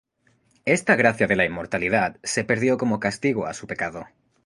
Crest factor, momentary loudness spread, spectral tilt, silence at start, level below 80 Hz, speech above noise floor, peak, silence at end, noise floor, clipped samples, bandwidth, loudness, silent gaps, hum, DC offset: 20 dB; 11 LU; -5 dB/octave; 0.65 s; -54 dBFS; 42 dB; -2 dBFS; 0.4 s; -64 dBFS; under 0.1%; 11.5 kHz; -22 LUFS; none; none; under 0.1%